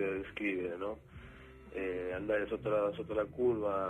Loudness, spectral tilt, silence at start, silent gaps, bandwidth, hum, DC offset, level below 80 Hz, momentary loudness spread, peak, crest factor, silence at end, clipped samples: -36 LUFS; -8 dB/octave; 0 s; none; 9 kHz; none; under 0.1%; -58 dBFS; 18 LU; -22 dBFS; 14 dB; 0 s; under 0.1%